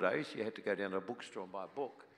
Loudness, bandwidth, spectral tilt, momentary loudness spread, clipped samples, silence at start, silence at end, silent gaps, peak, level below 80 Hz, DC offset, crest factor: -41 LUFS; 11.5 kHz; -5.5 dB/octave; 8 LU; under 0.1%; 0 s; 0.1 s; none; -18 dBFS; under -90 dBFS; under 0.1%; 22 dB